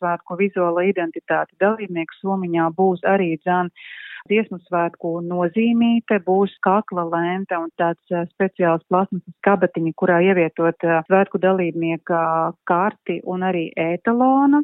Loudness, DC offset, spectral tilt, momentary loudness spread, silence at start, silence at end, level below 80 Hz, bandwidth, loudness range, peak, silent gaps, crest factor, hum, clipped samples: -20 LUFS; under 0.1%; -11.5 dB/octave; 8 LU; 0 s; 0 s; -70 dBFS; 4 kHz; 3 LU; -2 dBFS; none; 16 dB; none; under 0.1%